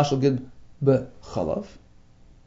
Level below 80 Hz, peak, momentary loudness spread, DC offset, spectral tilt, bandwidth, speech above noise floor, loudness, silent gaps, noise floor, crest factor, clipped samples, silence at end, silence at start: -50 dBFS; -6 dBFS; 11 LU; under 0.1%; -7.5 dB/octave; 7.8 kHz; 27 dB; -25 LUFS; none; -51 dBFS; 20 dB; under 0.1%; 0.7 s; 0 s